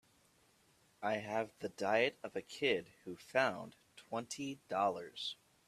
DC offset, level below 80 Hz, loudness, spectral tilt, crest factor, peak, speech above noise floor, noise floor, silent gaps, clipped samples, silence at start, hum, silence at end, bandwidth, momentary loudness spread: under 0.1%; -80 dBFS; -38 LUFS; -3.5 dB/octave; 22 dB; -16 dBFS; 33 dB; -71 dBFS; none; under 0.1%; 1 s; none; 0.35 s; 14 kHz; 12 LU